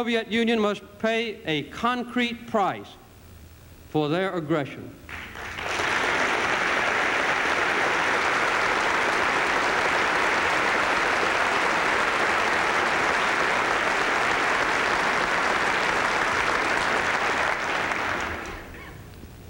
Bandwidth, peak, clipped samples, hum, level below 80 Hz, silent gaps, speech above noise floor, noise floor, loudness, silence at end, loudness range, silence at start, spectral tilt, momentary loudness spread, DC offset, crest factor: 17 kHz; -8 dBFS; under 0.1%; none; -50 dBFS; none; 20 dB; -47 dBFS; -23 LUFS; 0 s; 6 LU; 0 s; -3 dB/octave; 7 LU; under 0.1%; 16 dB